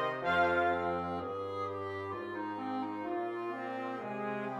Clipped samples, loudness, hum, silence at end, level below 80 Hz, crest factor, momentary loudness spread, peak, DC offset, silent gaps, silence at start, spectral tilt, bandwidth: under 0.1%; -35 LUFS; none; 0 s; -68 dBFS; 18 dB; 10 LU; -18 dBFS; under 0.1%; none; 0 s; -7 dB/octave; 11.5 kHz